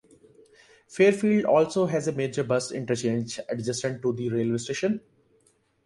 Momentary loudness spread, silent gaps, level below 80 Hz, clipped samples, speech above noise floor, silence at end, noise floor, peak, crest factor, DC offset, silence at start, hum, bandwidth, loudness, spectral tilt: 9 LU; none; -66 dBFS; under 0.1%; 41 dB; 0.85 s; -66 dBFS; -8 dBFS; 20 dB; under 0.1%; 0.9 s; none; 11.5 kHz; -26 LUFS; -5.5 dB/octave